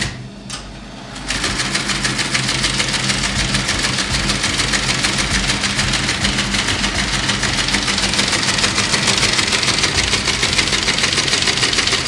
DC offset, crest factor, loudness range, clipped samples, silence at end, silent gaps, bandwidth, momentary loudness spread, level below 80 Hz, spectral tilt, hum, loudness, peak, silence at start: under 0.1%; 18 dB; 3 LU; under 0.1%; 0 s; none; 11.5 kHz; 6 LU; -32 dBFS; -2 dB/octave; none; -15 LUFS; 0 dBFS; 0 s